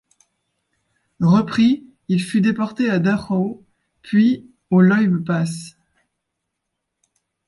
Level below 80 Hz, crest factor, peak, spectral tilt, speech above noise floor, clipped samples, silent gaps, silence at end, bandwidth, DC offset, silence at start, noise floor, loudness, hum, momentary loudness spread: -58 dBFS; 16 dB; -4 dBFS; -7.5 dB/octave; 61 dB; under 0.1%; none; 1.8 s; 11.5 kHz; under 0.1%; 1.2 s; -78 dBFS; -18 LUFS; none; 11 LU